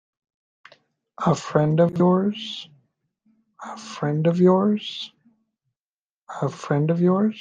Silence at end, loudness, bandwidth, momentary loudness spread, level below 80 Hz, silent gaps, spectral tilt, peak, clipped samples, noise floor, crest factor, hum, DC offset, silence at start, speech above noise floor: 0 s; -21 LUFS; 7.6 kHz; 18 LU; -64 dBFS; 5.81-6.27 s; -7.5 dB/octave; -6 dBFS; under 0.1%; under -90 dBFS; 18 dB; none; under 0.1%; 1.2 s; over 69 dB